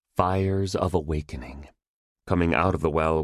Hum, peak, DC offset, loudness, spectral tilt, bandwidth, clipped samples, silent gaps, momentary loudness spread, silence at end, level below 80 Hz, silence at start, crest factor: none; -6 dBFS; under 0.1%; -25 LUFS; -7 dB/octave; 12.5 kHz; under 0.1%; 1.88-2.16 s; 16 LU; 0 s; -38 dBFS; 0.15 s; 18 dB